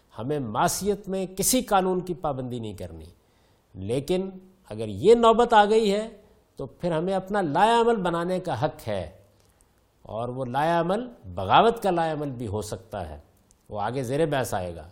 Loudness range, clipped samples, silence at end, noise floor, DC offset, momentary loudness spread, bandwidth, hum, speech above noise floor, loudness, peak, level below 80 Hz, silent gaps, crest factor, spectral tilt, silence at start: 6 LU; under 0.1%; 0 s; -62 dBFS; under 0.1%; 18 LU; 16.5 kHz; none; 38 dB; -24 LUFS; -6 dBFS; -52 dBFS; none; 20 dB; -4.5 dB/octave; 0.15 s